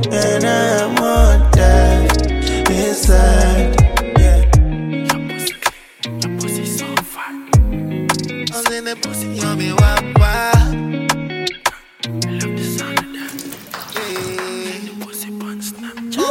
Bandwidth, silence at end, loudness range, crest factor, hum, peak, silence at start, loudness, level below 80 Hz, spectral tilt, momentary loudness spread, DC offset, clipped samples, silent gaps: 16.5 kHz; 0 s; 10 LU; 14 dB; none; 0 dBFS; 0 s; -16 LUFS; -18 dBFS; -5 dB/octave; 14 LU; under 0.1%; under 0.1%; none